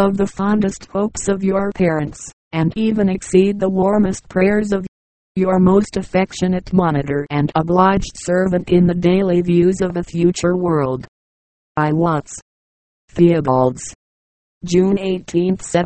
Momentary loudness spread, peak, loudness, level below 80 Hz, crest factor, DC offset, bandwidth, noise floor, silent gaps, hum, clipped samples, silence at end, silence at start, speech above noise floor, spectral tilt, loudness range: 9 LU; 0 dBFS; -17 LUFS; -40 dBFS; 16 dB; under 0.1%; 8.8 kHz; under -90 dBFS; 2.33-2.51 s, 4.88-5.35 s, 11.08-11.75 s, 12.42-13.08 s, 13.95-14.61 s; none; under 0.1%; 0 s; 0 s; over 74 dB; -7 dB/octave; 3 LU